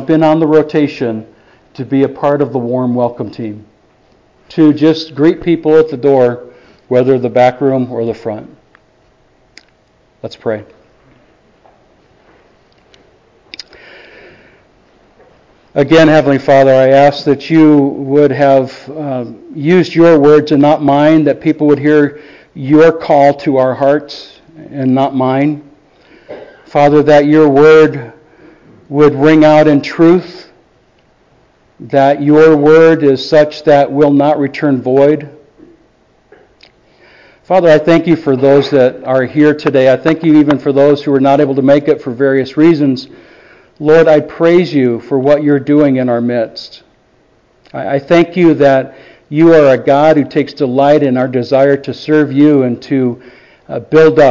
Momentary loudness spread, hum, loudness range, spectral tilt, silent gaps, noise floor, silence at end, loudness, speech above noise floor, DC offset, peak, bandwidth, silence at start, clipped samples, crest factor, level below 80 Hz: 14 LU; none; 7 LU; -8 dB/octave; none; -51 dBFS; 0 s; -9 LUFS; 42 dB; under 0.1%; 0 dBFS; 7.4 kHz; 0 s; under 0.1%; 10 dB; -50 dBFS